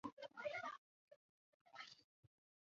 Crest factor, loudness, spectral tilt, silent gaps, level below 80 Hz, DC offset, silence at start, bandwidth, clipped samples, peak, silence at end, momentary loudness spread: 20 dB; -52 LUFS; -1.5 dB/octave; 0.13-0.17 s, 0.78-1.08 s, 1.16-1.65 s, 2.04-2.23 s; under -90 dBFS; under 0.1%; 0.05 s; 7.4 kHz; under 0.1%; -34 dBFS; 0.4 s; 14 LU